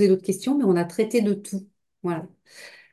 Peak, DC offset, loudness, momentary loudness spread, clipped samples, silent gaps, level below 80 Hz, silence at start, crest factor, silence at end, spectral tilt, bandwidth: -8 dBFS; under 0.1%; -24 LUFS; 23 LU; under 0.1%; none; -72 dBFS; 0 s; 16 dB; 0.25 s; -6.5 dB/octave; 12.5 kHz